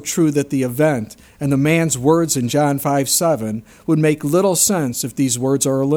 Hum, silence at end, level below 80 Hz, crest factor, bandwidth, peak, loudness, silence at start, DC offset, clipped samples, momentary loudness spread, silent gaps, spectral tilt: none; 0 s; -52 dBFS; 16 dB; 20 kHz; -2 dBFS; -17 LUFS; 0 s; under 0.1%; under 0.1%; 7 LU; none; -4.5 dB/octave